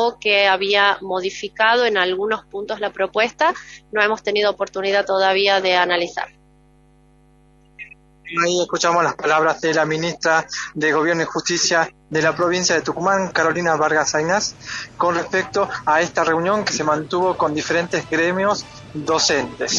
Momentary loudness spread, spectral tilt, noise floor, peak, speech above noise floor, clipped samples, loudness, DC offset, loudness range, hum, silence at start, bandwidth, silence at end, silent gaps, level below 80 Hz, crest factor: 10 LU; -3 dB/octave; -53 dBFS; 0 dBFS; 34 dB; under 0.1%; -19 LUFS; under 0.1%; 3 LU; none; 0 s; 8.2 kHz; 0 s; none; -56 dBFS; 18 dB